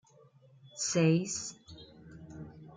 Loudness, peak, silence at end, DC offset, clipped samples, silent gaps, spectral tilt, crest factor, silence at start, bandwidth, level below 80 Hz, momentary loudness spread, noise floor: -31 LUFS; -14 dBFS; 0 s; under 0.1%; under 0.1%; none; -5 dB/octave; 20 dB; 0.65 s; 9.6 kHz; -68 dBFS; 25 LU; -61 dBFS